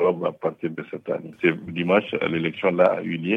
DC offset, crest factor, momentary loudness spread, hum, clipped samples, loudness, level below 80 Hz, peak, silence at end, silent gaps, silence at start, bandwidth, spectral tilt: under 0.1%; 18 dB; 11 LU; none; under 0.1%; -24 LUFS; -66 dBFS; -6 dBFS; 0 s; none; 0 s; 5.8 kHz; -8.5 dB/octave